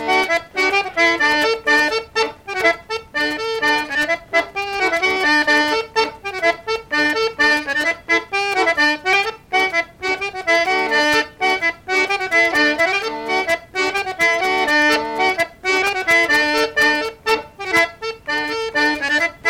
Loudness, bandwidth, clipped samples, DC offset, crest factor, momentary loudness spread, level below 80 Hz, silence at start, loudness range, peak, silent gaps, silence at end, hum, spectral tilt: -17 LUFS; 16.5 kHz; under 0.1%; under 0.1%; 14 dB; 6 LU; -52 dBFS; 0 s; 2 LU; -4 dBFS; none; 0 s; none; -2 dB/octave